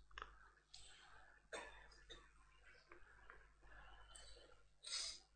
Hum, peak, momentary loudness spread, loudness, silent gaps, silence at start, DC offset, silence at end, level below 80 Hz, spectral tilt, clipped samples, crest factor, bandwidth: none; -34 dBFS; 20 LU; -55 LUFS; none; 0 s; under 0.1%; 0 s; -70 dBFS; 0 dB/octave; under 0.1%; 24 dB; 11 kHz